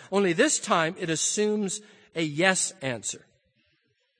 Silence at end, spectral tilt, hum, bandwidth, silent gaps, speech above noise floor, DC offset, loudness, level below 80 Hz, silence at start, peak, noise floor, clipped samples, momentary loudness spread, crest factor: 1 s; -3 dB/octave; none; 10 kHz; none; 46 dB; under 0.1%; -25 LUFS; -72 dBFS; 0 s; -4 dBFS; -71 dBFS; under 0.1%; 12 LU; 24 dB